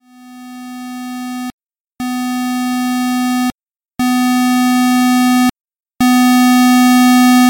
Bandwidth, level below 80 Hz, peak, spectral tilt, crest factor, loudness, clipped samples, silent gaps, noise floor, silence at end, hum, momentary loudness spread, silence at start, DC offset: 17 kHz; -52 dBFS; -4 dBFS; -2.5 dB/octave; 8 dB; -12 LUFS; under 0.1%; 1.53-1.58 s, 1.80-1.85 s, 5.61-5.65 s; -36 dBFS; 0 s; none; 18 LU; 0.25 s; under 0.1%